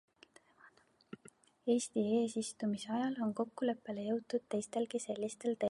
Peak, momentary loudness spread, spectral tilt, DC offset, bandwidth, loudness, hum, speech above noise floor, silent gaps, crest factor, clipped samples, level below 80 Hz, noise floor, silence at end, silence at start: -20 dBFS; 8 LU; -5 dB/octave; under 0.1%; 11.5 kHz; -37 LUFS; none; 29 dB; none; 18 dB; under 0.1%; -82 dBFS; -66 dBFS; 0.05 s; 0.65 s